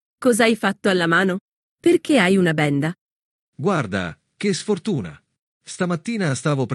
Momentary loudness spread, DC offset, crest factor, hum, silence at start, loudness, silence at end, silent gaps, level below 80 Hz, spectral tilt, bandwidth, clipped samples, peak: 11 LU; under 0.1%; 18 dB; none; 0.2 s; -20 LUFS; 0 s; 1.41-1.78 s, 2.98-3.53 s, 5.39-5.61 s; -64 dBFS; -5.5 dB/octave; 12.5 kHz; under 0.1%; -4 dBFS